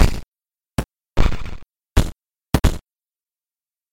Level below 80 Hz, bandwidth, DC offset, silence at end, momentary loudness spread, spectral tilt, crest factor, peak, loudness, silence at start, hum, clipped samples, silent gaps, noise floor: -24 dBFS; 17 kHz; under 0.1%; 1.1 s; 15 LU; -5.5 dB/octave; 18 dB; -4 dBFS; -24 LUFS; 0 s; none; under 0.1%; 0.27-0.32 s; under -90 dBFS